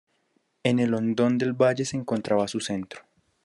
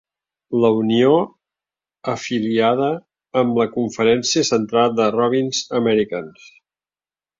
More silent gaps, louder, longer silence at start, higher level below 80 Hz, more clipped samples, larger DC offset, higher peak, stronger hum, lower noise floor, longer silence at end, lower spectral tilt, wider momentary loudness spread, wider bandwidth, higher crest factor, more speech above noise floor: neither; second, -25 LUFS vs -18 LUFS; first, 0.65 s vs 0.5 s; second, -72 dBFS vs -60 dBFS; neither; neither; second, -8 dBFS vs -2 dBFS; neither; second, -71 dBFS vs under -90 dBFS; second, 0.45 s vs 1.1 s; about the same, -5.5 dB/octave vs -4.5 dB/octave; about the same, 9 LU vs 10 LU; first, 11.5 kHz vs 7.6 kHz; about the same, 18 dB vs 16 dB; second, 46 dB vs over 72 dB